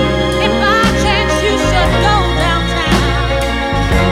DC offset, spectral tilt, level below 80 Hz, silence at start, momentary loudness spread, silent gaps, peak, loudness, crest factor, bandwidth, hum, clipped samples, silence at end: under 0.1%; -5 dB/octave; -20 dBFS; 0 s; 4 LU; none; 0 dBFS; -13 LUFS; 12 dB; 15.5 kHz; none; under 0.1%; 0 s